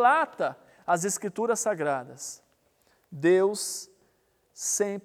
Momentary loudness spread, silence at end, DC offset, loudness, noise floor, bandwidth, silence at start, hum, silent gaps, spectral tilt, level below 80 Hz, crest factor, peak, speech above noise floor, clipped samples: 17 LU; 0.05 s; under 0.1%; -27 LUFS; -69 dBFS; 16 kHz; 0 s; none; none; -3.5 dB/octave; -78 dBFS; 18 dB; -10 dBFS; 42 dB; under 0.1%